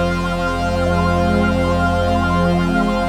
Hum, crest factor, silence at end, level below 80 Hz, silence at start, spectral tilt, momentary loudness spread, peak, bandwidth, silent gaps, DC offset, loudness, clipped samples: none; 12 dB; 0 s; -28 dBFS; 0 s; -7 dB/octave; 3 LU; -4 dBFS; 13.5 kHz; none; under 0.1%; -17 LUFS; under 0.1%